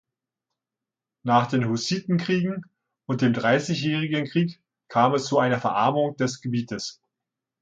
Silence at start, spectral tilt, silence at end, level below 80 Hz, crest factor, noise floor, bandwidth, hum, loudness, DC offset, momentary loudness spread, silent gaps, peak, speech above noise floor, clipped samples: 1.25 s; -6 dB/octave; 0.7 s; -66 dBFS; 20 dB; -88 dBFS; 9.2 kHz; none; -24 LUFS; under 0.1%; 10 LU; none; -6 dBFS; 65 dB; under 0.1%